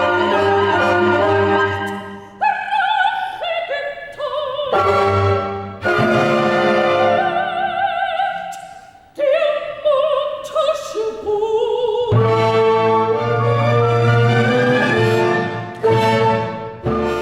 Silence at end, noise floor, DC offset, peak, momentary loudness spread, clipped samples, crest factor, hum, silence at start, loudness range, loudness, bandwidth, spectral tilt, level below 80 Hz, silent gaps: 0 s; -40 dBFS; under 0.1%; -4 dBFS; 9 LU; under 0.1%; 14 dB; none; 0 s; 4 LU; -17 LUFS; 12 kHz; -6.5 dB/octave; -48 dBFS; none